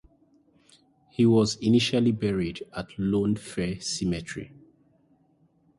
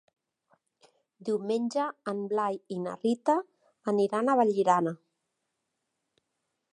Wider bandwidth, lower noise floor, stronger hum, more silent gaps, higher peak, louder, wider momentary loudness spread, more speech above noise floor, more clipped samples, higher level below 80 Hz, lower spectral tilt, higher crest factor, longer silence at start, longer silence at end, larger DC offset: about the same, 11.5 kHz vs 11 kHz; second, -64 dBFS vs -82 dBFS; neither; neither; about the same, -10 dBFS vs -10 dBFS; first, -26 LUFS vs -29 LUFS; first, 16 LU vs 10 LU; second, 39 dB vs 55 dB; neither; first, -52 dBFS vs -84 dBFS; about the same, -5.5 dB/octave vs -6.5 dB/octave; about the same, 18 dB vs 20 dB; about the same, 1.2 s vs 1.2 s; second, 1.3 s vs 1.8 s; neither